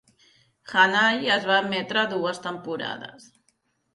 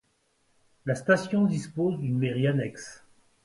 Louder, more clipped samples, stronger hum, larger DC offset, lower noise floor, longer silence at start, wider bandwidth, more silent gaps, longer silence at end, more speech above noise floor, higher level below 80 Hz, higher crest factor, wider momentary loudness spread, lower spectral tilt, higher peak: first, -23 LUFS vs -27 LUFS; neither; neither; neither; about the same, -70 dBFS vs -70 dBFS; second, 0.65 s vs 0.85 s; about the same, 11.5 kHz vs 11.5 kHz; neither; first, 0.85 s vs 0.5 s; about the same, 46 dB vs 44 dB; second, -72 dBFS vs -66 dBFS; about the same, 20 dB vs 20 dB; about the same, 14 LU vs 13 LU; second, -3.5 dB/octave vs -7 dB/octave; about the same, -6 dBFS vs -8 dBFS